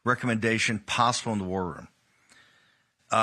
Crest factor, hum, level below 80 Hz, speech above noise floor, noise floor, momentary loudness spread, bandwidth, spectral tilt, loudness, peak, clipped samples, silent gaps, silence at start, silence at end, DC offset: 20 dB; none; -62 dBFS; 39 dB; -66 dBFS; 9 LU; 12.5 kHz; -4 dB/octave; -27 LUFS; -8 dBFS; under 0.1%; none; 0.05 s; 0 s; under 0.1%